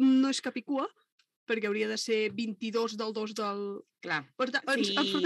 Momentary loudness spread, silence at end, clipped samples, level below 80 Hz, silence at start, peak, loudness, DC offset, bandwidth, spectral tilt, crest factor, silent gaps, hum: 8 LU; 0 s; under 0.1%; -88 dBFS; 0 s; -14 dBFS; -31 LUFS; under 0.1%; 12 kHz; -3.5 dB/octave; 16 dB; 1.12-1.18 s, 1.36-1.47 s; none